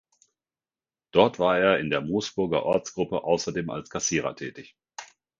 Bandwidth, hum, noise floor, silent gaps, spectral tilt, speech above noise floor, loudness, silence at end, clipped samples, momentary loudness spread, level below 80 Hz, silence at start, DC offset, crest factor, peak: 7.6 kHz; none; under -90 dBFS; none; -4 dB/octave; over 65 dB; -25 LUFS; 0.35 s; under 0.1%; 17 LU; -58 dBFS; 1.15 s; under 0.1%; 24 dB; -4 dBFS